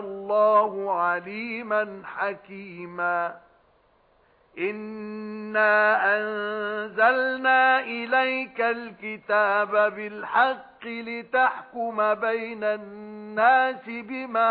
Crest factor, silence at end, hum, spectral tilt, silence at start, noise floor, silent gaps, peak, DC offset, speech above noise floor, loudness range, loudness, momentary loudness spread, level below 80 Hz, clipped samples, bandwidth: 16 dB; 0 s; none; -7.5 dB/octave; 0 s; -62 dBFS; none; -10 dBFS; under 0.1%; 38 dB; 9 LU; -24 LUFS; 15 LU; -72 dBFS; under 0.1%; 4.9 kHz